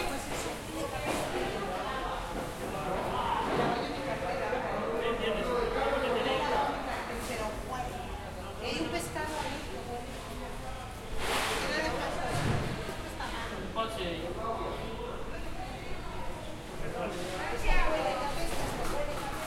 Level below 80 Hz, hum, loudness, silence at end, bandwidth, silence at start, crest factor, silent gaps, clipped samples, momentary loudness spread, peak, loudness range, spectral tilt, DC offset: -42 dBFS; none; -34 LUFS; 0 s; 16.5 kHz; 0 s; 20 dB; none; under 0.1%; 10 LU; -14 dBFS; 6 LU; -4.5 dB/octave; under 0.1%